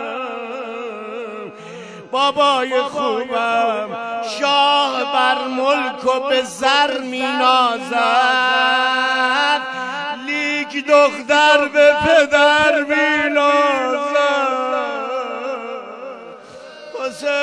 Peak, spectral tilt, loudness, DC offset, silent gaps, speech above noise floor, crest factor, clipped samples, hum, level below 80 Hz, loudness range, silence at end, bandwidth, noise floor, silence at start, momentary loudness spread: 0 dBFS; -2.5 dB/octave; -16 LUFS; under 0.1%; none; 22 dB; 18 dB; under 0.1%; none; -60 dBFS; 6 LU; 0 s; 11 kHz; -37 dBFS; 0 s; 16 LU